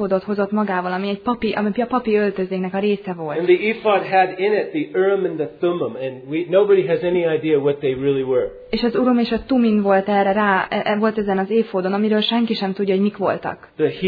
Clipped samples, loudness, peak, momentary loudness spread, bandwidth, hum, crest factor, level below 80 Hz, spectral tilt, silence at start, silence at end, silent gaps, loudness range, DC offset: under 0.1%; -19 LUFS; -4 dBFS; 6 LU; 5 kHz; none; 16 dB; -52 dBFS; -9 dB/octave; 0 s; 0 s; none; 2 LU; under 0.1%